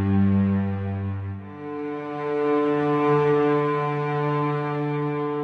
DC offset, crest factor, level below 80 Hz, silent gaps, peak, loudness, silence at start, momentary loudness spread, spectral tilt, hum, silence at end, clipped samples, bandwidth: under 0.1%; 14 dB; -64 dBFS; none; -10 dBFS; -24 LUFS; 0 s; 11 LU; -9.5 dB/octave; none; 0 s; under 0.1%; 6.4 kHz